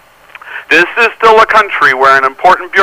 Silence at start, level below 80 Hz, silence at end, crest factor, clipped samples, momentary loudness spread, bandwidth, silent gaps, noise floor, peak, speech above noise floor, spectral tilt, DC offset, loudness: 0.45 s; -48 dBFS; 0 s; 8 dB; 0.3%; 4 LU; 16 kHz; none; -34 dBFS; 0 dBFS; 27 dB; -3 dB/octave; under 0.1%; -7 LUFS